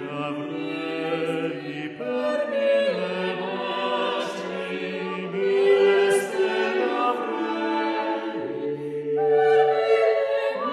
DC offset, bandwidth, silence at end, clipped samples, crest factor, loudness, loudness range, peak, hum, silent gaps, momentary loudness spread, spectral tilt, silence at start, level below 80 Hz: under 0.1%; 13 kHz; 0 s; under 0.1%; 16 dB; -24 LUFS; 3 LU; -8 dBFS; none; none; 11 LU; -5 dB/octave; 0 s; -74 dBFS